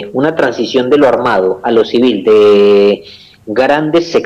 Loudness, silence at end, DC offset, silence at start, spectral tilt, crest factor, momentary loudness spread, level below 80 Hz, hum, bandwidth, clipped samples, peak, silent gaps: -10 LUFS; 0 s; under 0.1%; 0 s; -6 dB/octave; 8 dB; 7 LU; -50 dBFS; none; 8 kHz; under 0.1%; -2 dBFS; none